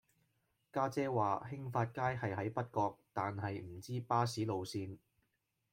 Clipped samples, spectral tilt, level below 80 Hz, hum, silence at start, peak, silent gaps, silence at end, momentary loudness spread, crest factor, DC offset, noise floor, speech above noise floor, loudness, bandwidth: under 0.1%; -6.5 dB/octave; -74 dBFS; none; 0.75 s; -20 dBFS; none; 0.75 s; 9 LU; 18 dB; under 0.1%; -83 dBFS; 45 dB; -39 LUFS; 16.5 kHz